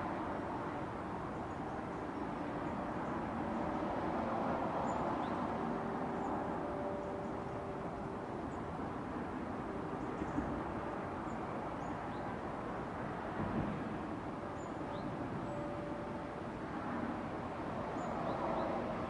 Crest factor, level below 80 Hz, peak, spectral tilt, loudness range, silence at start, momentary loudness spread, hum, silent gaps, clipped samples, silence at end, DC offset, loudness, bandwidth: 16 dB; -58 dBFS; -24 dBFS; -7.5 dB/octave; 4 LU; 0 s; 5 LU; none; none; under 0.1%; 0 s; under 0.1%; -41 LUFS; 11 kHz